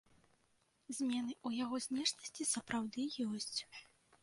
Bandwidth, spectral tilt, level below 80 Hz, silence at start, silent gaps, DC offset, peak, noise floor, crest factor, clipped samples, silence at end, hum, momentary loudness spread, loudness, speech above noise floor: 11.5 kHz; -2 dB/octave; -78 dBFS; 0.9 s; none; under 0.1%; -22 dBFS; -77 dBFS; 20 dB; under 0.1%; 0.4 s; none; 6 LU; -40 LUFS; 36 dB